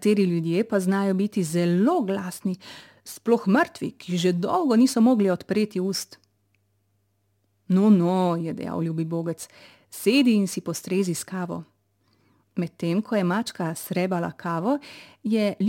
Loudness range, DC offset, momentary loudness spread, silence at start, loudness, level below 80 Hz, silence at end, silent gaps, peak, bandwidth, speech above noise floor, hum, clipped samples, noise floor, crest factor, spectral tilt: 5 LU; under 0.1%; 14 LU; 0 s; -24 LUFS; -72 dBFS; 0 s; none; -8 dBFS; 17 kHz; 47 dB; none; under 0.1%; -70 dBFS; 16 dB; -6 dB/octave